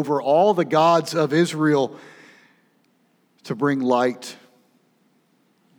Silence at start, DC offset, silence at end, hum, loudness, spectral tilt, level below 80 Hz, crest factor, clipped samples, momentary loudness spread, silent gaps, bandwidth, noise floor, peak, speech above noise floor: 0 s; under 0.1%; 1.45 s; none; -20 LUFS; -6 dB/octave; -86 dBFS; 18 dB; under 0.1%; 12 LU; none; 20 kHz; -63 dBFS; -4 dBFS; 44 dB